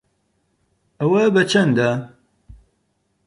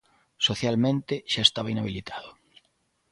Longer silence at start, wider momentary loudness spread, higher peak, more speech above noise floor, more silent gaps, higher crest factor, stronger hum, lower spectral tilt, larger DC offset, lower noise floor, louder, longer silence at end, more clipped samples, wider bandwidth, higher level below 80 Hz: first, 1 s vs 0.4 s; second, 11 LU vs 15 LU; about the same, -4 dBFS vs -4 dBFS; first, 52 dB vs 45 dB; neither; second, 16 dB vs 24 dB; neither; first, -6 dB/octave vs -4.5 dB/octave; neither; about the same, -68 dBFS vs -71 dBFS; first, -17 LUFS vs -25 LUFS; first, 1.2 s vs 0.8 s; neither; about the same, 11 kHz vs 11.5 kHz; about the same, -56 dBFS vs -56 dBFS